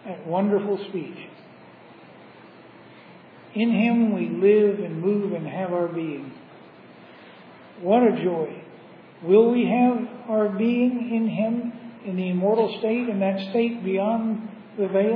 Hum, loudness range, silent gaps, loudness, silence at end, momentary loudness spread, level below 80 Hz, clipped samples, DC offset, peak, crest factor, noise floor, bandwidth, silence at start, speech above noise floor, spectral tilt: none; 7 LU; none; -23 LUFS; 0 s; 14 LU; -82 dBFS; under 0.1%; under 0.1%; -6 dBFS; 18 dB; -47 dBFS; 5.2 kHz; 0.05 s; 25 dB; -10.5 dB/octave